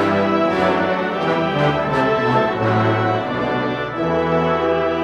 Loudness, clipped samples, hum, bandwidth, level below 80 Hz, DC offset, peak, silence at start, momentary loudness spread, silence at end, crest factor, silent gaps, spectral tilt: -18 LUFS; under 0.1%; none; 11 kHz; -46 dBFS; under 0.1%; -4 dBFS; 0 s; 4 LU; 0 s; 14 dB; none; -7.5 dB/octave